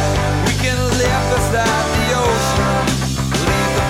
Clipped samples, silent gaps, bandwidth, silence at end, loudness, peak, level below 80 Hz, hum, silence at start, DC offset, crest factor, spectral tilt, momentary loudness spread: under 0.1%; none; 17 kHz; 0 s; -16 LUFS; -6 dBFS; -26 dBFS; none; 0 s; under 0.1%; 10 dB; -4.5 dB/octave; 2 LU